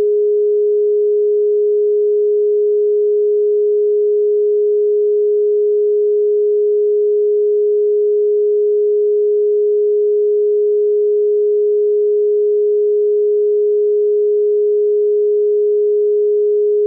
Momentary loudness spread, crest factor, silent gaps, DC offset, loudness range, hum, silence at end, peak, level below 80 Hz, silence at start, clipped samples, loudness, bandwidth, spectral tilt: 0 LU; 4 dB; none; under 0.1%; 0 LU; none; 0 s; -10 dBFS; under -90 dBFS; 0 s; under 0.1%; -14 LUFS; 0.5 kHz; -1 dB/octave